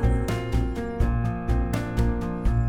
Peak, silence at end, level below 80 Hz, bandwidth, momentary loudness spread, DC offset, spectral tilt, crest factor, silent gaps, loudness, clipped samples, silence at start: -10 dBFS; 0 s; -26 dBFS; 14.5 kHz; 2 LU; under 0.1%; -7.5 dB/octave; 14 dB; none; -26 LUFS; under 0.1%; 0 s